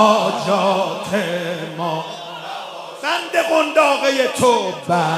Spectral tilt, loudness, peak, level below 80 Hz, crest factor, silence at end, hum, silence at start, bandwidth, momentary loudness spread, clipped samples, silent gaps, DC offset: -4 dB/octave; -18 LUFS; 0 dBFS; -66 dBFS; 18 dB; 0 s; none; 0 s; 16 kHz; 14 LU; under 0.1%; none; under 0.1%